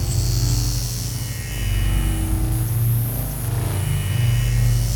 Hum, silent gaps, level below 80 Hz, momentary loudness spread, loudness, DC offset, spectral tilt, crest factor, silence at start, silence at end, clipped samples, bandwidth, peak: none; none; -26 dBFS; 6 LU; -22 LUFS; under 0.1%; -5 dB/octave; 12 dB; 0 s; 0 s; under 0.1%; 19.5 kHz; -8 dBFS